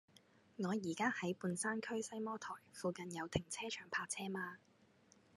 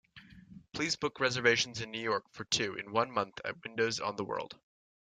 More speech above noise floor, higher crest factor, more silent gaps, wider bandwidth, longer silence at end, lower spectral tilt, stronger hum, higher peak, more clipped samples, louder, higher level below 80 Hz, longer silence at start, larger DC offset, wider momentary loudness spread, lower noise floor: first, 27 dB vs 21 dB; about the same, 24 dB vs 22 dB; neither; first, 13 kHz vs 9.4 kHz; first, 0.8 s vs 0.45 s; about the same, -4 dB/octave vs -3 dB/octave; neither; second, -20 dBFS vs -14 dBFS; neither; second, -43 LUFS vs -33 LUFS; second, -74 dBFS vs -68 dBFS; about the same, 0.15 s vs 0.15 s; neither; about the same, 9 LU vs 11 LU; first, -70 dBFS vs -55 dBFS